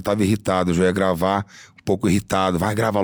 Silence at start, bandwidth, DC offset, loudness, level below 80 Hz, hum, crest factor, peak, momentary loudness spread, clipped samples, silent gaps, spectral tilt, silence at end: 0 s; over 20 kHz; under 0.1%; -20 LUFS; -46 dBFS; none; 16 dB; -4 dBFS; 7 LU; under 0.1%; none; -6 dB/octave; 0 s